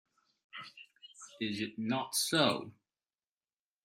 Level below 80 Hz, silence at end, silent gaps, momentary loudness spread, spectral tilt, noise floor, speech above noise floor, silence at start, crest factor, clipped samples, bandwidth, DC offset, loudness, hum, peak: -80 dBFS; 1.15 s; none; 23 LU; -3 dB/octave; under -90 dBFS; over 56 dB; 0.55 s; 24 dB; under 0.1%; 16 kHz; under 0.1%; -33 LUFS; none; -14 dBFS